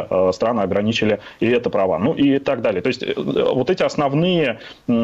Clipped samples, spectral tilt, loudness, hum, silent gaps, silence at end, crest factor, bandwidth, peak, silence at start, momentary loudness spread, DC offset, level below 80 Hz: under 0.1%; -6.5 dB/octave; -19 LUFS; none; none; 0 s; 14 dB; 8 kHz; -4 dBFS; 0 s; 4 LU; under 0.1%; -52 dBFS